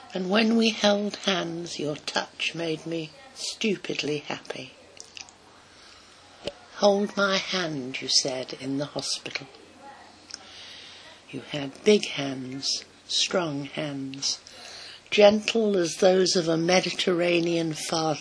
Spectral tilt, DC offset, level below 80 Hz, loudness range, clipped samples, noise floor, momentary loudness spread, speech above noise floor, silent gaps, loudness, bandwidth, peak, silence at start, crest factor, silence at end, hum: -3.5 dB/octave; under 0.1%; -68 dBFS; 10 LU; under 0.1%; -52 dBFS; 19 LU; 27 dB; none; -25 LUFS; 11 kHz; -4 dBFS; 0 s; 24 dB; 0 s; none